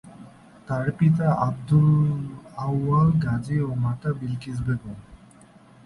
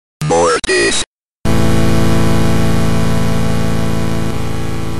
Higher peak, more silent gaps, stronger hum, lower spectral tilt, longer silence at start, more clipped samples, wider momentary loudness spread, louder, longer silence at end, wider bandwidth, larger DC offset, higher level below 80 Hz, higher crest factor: second, -8 dBFS vs 0 dBFS; second, none vs 1.07-1.44 s; neither; first, -9.5 dB/octave vs -5 dB/octave; second, 0.05 s vs 0.2 s; neither; first, 11 LU vs 8 LU; second, -23 LUFS vs -15 LUFS; first, 0.7 s vs 0 s; second, 11 kHz vs 13 kHz; second, under 0.1% vs 20%; second, -48 dBFS vs -26 dBFS; about the same, 16 dB vs 12 dB